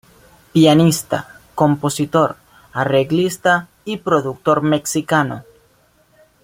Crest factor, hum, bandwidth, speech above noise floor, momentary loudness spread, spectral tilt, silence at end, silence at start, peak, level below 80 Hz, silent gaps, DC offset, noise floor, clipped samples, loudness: 16 dB; none; 16.5 kHz; 40 dB; 12 LU; -5.5 dB/octave; 1.05 s; 0.55 s; -2 dBFS; -54 dBFS; none; under 0.1%; -56 dBFS; under 0.1%; -17 LUFS